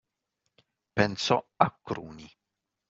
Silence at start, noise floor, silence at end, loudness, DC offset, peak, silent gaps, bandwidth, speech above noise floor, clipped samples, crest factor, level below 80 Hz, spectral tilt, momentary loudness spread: 0.95 s; -82 dBFS; 0.65 s; -28 LUFS; under 0.1%; -4 dBFS; none; 7.6 kHz; 53 dB; under 0.1%; 28 dB; -64 dBFS; -3.5 dB/octave; 17 LU